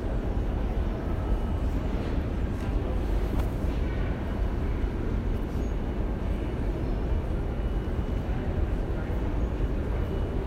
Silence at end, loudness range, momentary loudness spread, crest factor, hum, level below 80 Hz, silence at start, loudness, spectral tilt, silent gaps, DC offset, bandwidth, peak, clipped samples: 0 s; 1 LU; 1 LU; 12 dB; none; -30 dBFS; 0 s; -31 LUFS; -8.5 dB/octave; none; under 0.1%; 8.8 kHz; -16 dBFS; under 0.1%